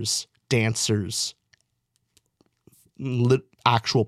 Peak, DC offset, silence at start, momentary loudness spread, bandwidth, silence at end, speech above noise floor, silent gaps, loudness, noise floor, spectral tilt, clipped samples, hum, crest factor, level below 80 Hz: -2 dBFS; under 0.1%; 0 s; 8 LU; 14.5 kHz; 0 s; 51 dB; none; -24 LUFS; -74 dBFS; -4.5 dB/octave; under 0.1%; none; 24 dB; -62 dBFS